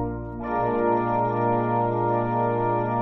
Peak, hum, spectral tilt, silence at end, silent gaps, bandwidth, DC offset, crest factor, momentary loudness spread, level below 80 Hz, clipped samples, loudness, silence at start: -10 dBFS; none; -8.5 dB/octave; 0 s; none; 5.8 kHz; under 0.1%; 14 dB; 5 LU; -46 dBFS; under 0.1%; -24 LUFS; 0 s